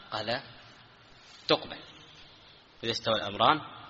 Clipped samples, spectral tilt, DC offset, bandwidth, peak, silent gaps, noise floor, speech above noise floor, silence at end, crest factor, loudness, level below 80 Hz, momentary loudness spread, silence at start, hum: under 0.1%; -1.5 dB/octave; under 0.1%; 7.6 kHz; -8 dBFS; none; -56 dBFS; 26 dB; 0 s; 26 dB; -29 LUFS; -64 dBFS; 25 LU; 0 s; none